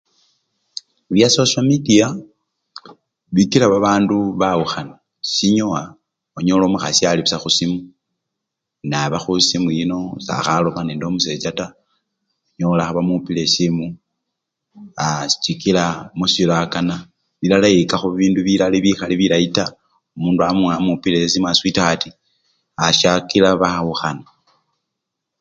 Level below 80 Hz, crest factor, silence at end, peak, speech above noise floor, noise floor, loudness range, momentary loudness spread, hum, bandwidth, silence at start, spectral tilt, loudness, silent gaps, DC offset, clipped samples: -50 dBFS; 18 dB; 1.2 s; 0 dBFS; 64 dB; -80 dBFS; 4 LU; 12 LU; none; 9.4 kHz; 1.1 s; -4.5 dB/octave; -17 LUFS; none; under 0.1%; under 0.1%